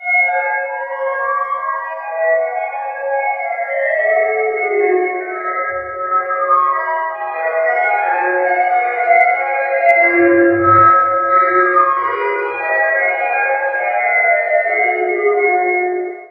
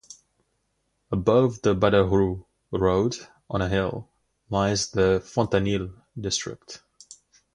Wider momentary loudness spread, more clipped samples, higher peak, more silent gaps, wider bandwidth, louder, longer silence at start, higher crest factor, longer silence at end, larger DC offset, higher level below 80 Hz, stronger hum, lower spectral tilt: second, 9 LU vs 17 LU; neither; first, 0 dBFS vs -4 dBFS; neither; second, 5 kHz vs 11 kHz; first, -15 LUFS vs -24 LUFS; about the same, 0 s vs 0.1 s; second, 14 dB vs 20 dB; second, 0.05 s vs 0.75 s; neither; second, -58 dBFS vs -44 dBFS; neither; first, -8 dB/octave vs -5.5 dB/octave